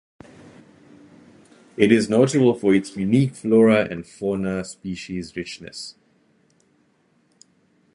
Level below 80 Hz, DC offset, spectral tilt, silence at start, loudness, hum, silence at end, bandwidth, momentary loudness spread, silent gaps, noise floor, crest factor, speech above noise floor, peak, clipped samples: -56 dBFS; under 0.1%; -6.5 dB/octave; 1.8 s; -20 LUFS; none; 2.05 s; 11 kHz; 17 LU; none; -63 dBFS; 22 dB; 43 dB; -2 dBFS; under 0.1%